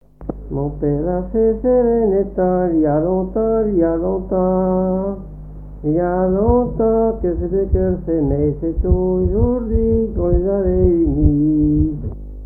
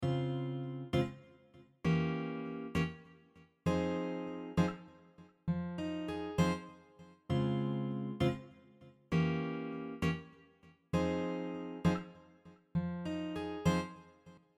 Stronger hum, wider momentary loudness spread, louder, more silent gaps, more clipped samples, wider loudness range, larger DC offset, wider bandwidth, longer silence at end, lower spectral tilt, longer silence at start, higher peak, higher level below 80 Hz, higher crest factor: first, 50 Hz at -30 dBFS vs none; about the same, 9 LU vs 10 LU; first, -17 LUFS vs -37 LUFS; neither; neither; about the same, 2 LU vs 2 LU; first, 0.3% vs under 0.1%; second, 2.3 kHz vs 12 kHz; second, 0 s vs 0.2 s; first, -14 dB/octave vs -7 dB/octave; first, 0.2 s vs 0 s; first, 0 dBFS vs -18 dBFS; first, -26 dBFS vs -58 dBFS; about the same, 16 dB vs 20 dB